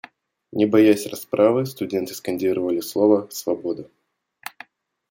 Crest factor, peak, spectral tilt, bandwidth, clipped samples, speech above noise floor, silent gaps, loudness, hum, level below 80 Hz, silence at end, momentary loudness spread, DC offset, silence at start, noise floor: 18 dB; -2 dBFS; -5.5 dB/octave; 17 kHz; under 0.1%; 28 dB; none; -21 LUFS; none; -68 dBFS; 1.25 s; 17 LU; under 0.1%; 0.55 s; -48 dBFS